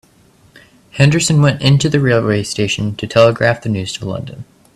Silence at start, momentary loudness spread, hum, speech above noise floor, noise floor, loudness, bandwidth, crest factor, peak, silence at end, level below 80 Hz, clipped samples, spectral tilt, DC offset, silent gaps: 0.95 s; 13 LU; none; 36 dB; -49 dBFS; -14 LUFS; 13 kHz; 14 dB; 0 dBFS; 0.3 s; -46 dBFS; under 0.1%; -5.5 dB/octave; under 0.1%; none